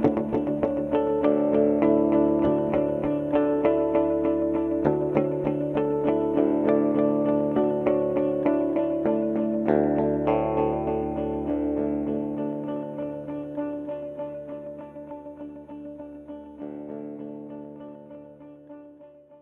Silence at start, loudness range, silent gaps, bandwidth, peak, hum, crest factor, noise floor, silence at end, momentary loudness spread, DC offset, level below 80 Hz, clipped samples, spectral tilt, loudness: 0 s; 16 LU; none; 3.8 kHz; -6 dBFS; none; 20 dB; -50 dBFS; 0.05 s; 18 LU; under 0.1%; -50 dBFS; under 0.1%; -10 dB/octave; -25 LUFS